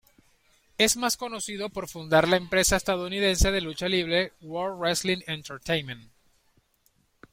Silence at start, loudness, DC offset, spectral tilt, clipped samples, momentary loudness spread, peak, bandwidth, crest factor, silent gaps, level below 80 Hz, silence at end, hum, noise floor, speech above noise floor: 0.8 s; -26 LUFS; under 0.1%; -3 dB/octave; under 0.1%; 12 LU; -6 dBFS; 16.5 kHz; 20 dB; none; -40 dBFS; 1.3 s; none; -68 dBFS; 42 dB